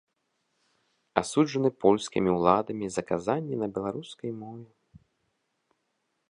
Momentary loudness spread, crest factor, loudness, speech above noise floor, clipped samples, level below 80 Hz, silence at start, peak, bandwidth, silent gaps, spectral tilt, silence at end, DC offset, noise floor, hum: 14 LU; 26 dB; -28 LUFS; 51 dB; under 0.1%; -62 dBFS; 1.15 s; -2 dBFS; 11 kHz; none; -6 dB/octave; 1.65 s; under 0.1%; -78 dBFS; none